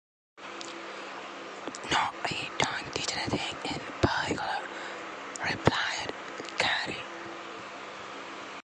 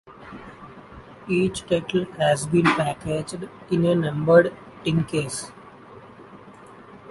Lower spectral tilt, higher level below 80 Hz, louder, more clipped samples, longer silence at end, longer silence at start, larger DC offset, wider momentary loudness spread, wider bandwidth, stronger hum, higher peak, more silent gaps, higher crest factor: second, -3.5 dB/octave vs -6 dB/octave; about the same, -54 dBFS vs -54 dBFS; second, -32 LUFS vs -22 LUFS; neither; about the same, 0.05 s vs 0 s; first, 0.35 s vs 0.1 s; neither; second, 13 LU vs 24 LU; about the same, 11 kHz vs 11.5 kHz; neither; second, -6 dBFS vs -2 dBFS; neither; first, 28 dB vs 22 dB